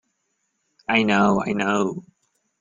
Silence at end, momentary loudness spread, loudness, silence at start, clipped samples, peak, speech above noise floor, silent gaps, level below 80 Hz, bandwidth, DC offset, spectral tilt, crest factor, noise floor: 0.6 s; 14 LU; -21 LUFS; 0.9 s; under 0.1%; -4 dBFS; 53 dB; none; -58 dBFS; 7.6 kHz; under 0.1%; -5.5 dB/octave; 20 dB; -73 dBFS